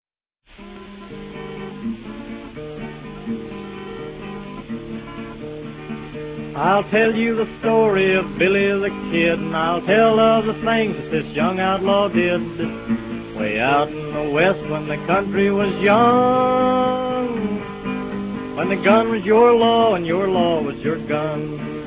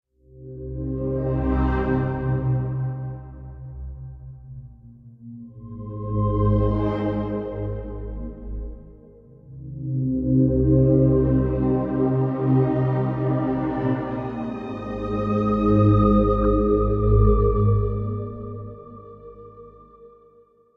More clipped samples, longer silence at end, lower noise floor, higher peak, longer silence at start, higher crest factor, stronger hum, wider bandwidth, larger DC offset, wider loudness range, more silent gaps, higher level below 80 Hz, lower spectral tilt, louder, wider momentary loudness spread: neither; second, 0 s vs 0.7 s; about the same, -58 dBFS vs -55 dBFS; first, -2 dBFS vs -6 dBFS; first, 0.6 s vs 0.35 s; about the same, 18 dB vs 16 dB; neither; about the same, 4 kHz vs 4.3 kHz; neither; first, 14 LU vs 10 LU; neither; second, -46 dBFS vs -32 dBFS; second, -10 dB/octave vs -11.5 dB/octave; first, -19 LUFS vs -22 LUFS; second, 17 LU vs 22 LU